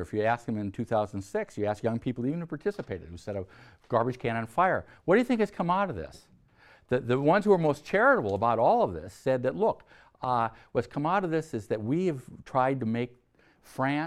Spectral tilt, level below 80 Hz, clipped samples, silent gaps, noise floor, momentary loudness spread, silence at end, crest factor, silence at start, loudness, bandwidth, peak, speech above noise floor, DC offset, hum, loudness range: -7.5 dB/octave; -60 dBFS; under 0.1%; none; -59 dBFS; 14 LU; 0 s; 18 dB; 0 s; -28 LUFS; 13.5 kHz; -10 dBFS; 31 dB; under 0.1%; none; 6 LU